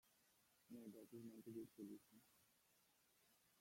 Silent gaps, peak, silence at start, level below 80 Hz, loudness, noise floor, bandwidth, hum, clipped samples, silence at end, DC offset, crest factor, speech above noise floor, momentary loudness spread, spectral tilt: none; -44 dBFS; 0.05 s; under -90 dBFS; -60 LUFS; -80 dBFS; 16.5 kHz; none; under 0.1%; 0 s; under 0.1%; 18 dB; 21 dB; 6 LU; -6 dB/octave